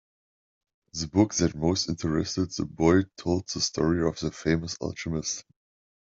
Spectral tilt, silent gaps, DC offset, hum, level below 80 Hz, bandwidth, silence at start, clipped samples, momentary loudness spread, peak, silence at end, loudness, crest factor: -5 dB/octave; none; under 0.1%; none; -52 dBFS; 7.8 kHz; 0.95 s; under 0.1%; 10 LU; -6 dBFS; 0.75 s; -27 LUFS; 22 dB